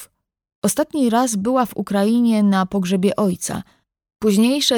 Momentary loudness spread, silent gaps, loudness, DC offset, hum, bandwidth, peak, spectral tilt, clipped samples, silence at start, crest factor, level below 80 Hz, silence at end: 7 LU; 0.55-0.62 s; -18 LUFS; under 0.1%; none; 20 kHz; -4 dBFS; -5 dB/octave; under 0.1%; 0 s; 14 dB; -56 dBFS; 0 s